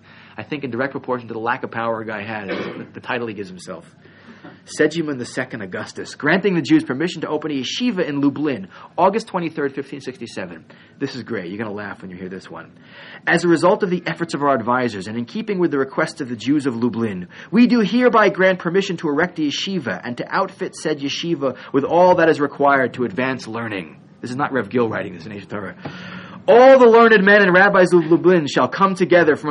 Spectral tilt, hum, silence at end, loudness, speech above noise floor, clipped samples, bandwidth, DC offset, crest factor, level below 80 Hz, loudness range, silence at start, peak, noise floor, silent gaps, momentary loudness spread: -6 dB/octave; none; 0 s; -18 LUFS; 24 dB; under 0.1%; 10.5 kHz; under 0.1%; 18 dB; -64 dBFS; 13 LU; 0.4 s; 0 dBFS; -42 dBFS; none; 19 LU